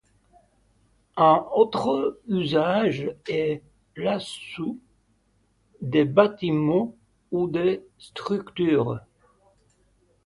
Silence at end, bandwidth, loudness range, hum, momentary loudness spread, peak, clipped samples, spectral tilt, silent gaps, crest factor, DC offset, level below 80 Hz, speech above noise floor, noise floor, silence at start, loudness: 1.25 s; 11.5 kHz; 5 LU; none; 15 LU; -4 dBFS; under 0.1%; -7 dB/octave; none; 22 dB; under 0.1%; -62 dBFS; 43 dB; -66 dBFS; 1.15 s; -24 LUFS